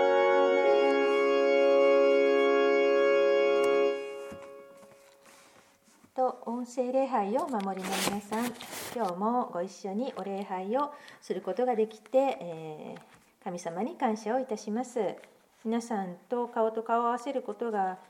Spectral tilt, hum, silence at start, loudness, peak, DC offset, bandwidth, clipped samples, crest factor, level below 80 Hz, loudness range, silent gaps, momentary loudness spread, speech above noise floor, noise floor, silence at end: -4.5 dB/octave; none; 0 s; -28 LUFS; -14 dBFS; under 0.1%; 17 kHz; under 0.1%; 16 dB; -78 dBFS; 10 LU; none; 16 LU; 30 dB; -62 dBFS; 0.1 s